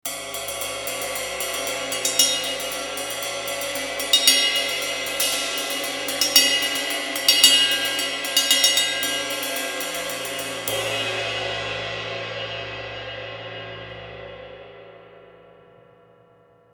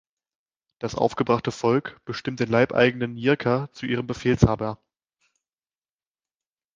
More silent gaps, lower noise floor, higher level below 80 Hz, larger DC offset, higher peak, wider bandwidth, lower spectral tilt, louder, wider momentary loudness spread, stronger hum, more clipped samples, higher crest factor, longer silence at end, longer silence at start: neither; second, -55 dBFS vs under -90 dBFS; second, -56 dBFS vs -46 dBFS; neither; about the same, 0 dBFS vs 0 dBFS; first, 19.5 kHz vs 7.6 kHz; second, 0 dB/octave vs -6.5 dB/octave; first, -20 LUFS vs -24 LUFS; first, 17 LU vs 12 LU; neither; neither; about the same, 24 dB vs 24 dB; second, 1.45 s vs 2 s; second, 0.05 s vs 0.8 s